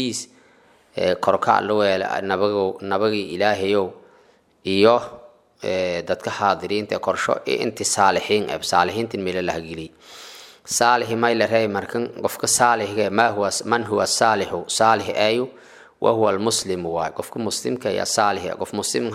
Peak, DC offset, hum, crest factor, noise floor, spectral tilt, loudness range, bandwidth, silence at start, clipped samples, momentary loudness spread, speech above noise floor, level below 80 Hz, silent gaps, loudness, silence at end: -2 dBFS; under 0.1%; none; 20 dB; -56 dBFS; -3 dB/octave; 3 LU; 16 kHz; 0 s; under 0.1%; 10 LU; 35 dB; -60 dBFS; none; -21 LUFS; 0 s